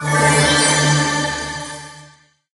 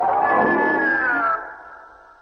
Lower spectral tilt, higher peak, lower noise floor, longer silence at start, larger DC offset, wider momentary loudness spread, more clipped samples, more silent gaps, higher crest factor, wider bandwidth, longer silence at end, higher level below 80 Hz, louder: second, -3 dB/octave vs -7.5 dB/octave; first, 0 dBFS vs -6 dBFS; first, -49 dBFS vs -44 dBFS; about the same, 0 s vs 0 s; neither; about the same, 16 LU vs 14 LU; neither; neither; about the same, 16 dB vs 14 dB; first, 11.5 kHz vs 6.4 kHz; first, 0.5 s vs 0.35 s; first, -42 dBFS vs -56 dBFS; first, -15 LUFS vs -19 LUFS